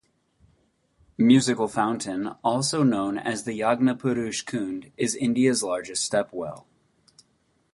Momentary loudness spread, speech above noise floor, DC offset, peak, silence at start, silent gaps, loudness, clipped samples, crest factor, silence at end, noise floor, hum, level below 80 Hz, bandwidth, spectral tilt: 11 LU; 44 dB; under 0.1%; -6 dBFS; 1.2 s; none; -24 LUFS; under 0.1%; 20 dB; 1.15 s; -68 dBFS; none; -64 dBFS; 11.5 kHz; -4.5 dB/octave